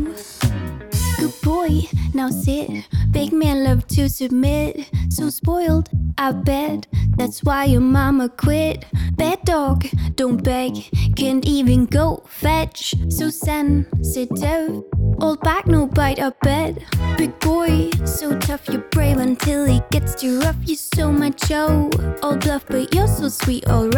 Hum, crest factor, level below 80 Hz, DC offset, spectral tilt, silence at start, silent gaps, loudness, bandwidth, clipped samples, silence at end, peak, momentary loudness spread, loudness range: none; 16 dB; -26 dBFS; under 0.1%; -6 dB/octave; 0 s; none; -19 LUFS; 19.5 kHz; under 0.1%; 0 s; -2 dBFS; 6 LU; 2 LU